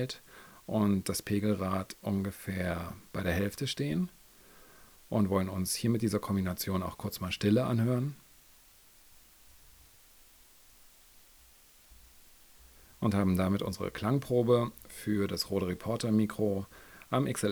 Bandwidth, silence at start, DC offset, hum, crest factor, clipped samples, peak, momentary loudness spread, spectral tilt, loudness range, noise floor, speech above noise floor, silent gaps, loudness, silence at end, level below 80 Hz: over 20 kHz; 0 s; under 0.1%; none; 18 dB; under 0.1%; -14 dBFS; 10 LU; -6 dB/octave; 5 LU; -59 dBFS; 28 dB; none; -32 LUFS; 0 s; -60 dBFS